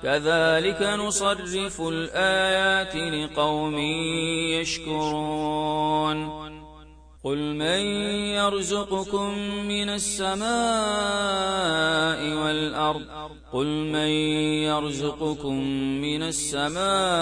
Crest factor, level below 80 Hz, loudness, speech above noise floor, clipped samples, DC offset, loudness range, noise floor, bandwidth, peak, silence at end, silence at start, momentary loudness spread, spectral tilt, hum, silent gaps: 16 dB; -50 dBFS; -25 LUFS; 23 dB; under 0.1%; under 0.1%; 3 LU; -48 dBFS; 10.5 kHz; -10 dBFS; 0 s; 0 s; 7 LU; -3.5 dB/octave; none; none